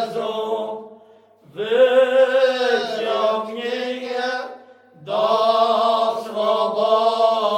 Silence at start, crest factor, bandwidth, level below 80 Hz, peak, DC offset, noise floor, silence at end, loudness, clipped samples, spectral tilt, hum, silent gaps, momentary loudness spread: 0 s; 16 dB; 12 kHz; -76 dBFS; -4 dBFS; under 0.1%; -50 dBFS; 0 s; -19 LUFS; under 0.1%; -3.5 dB/octave; none; none; 11 LU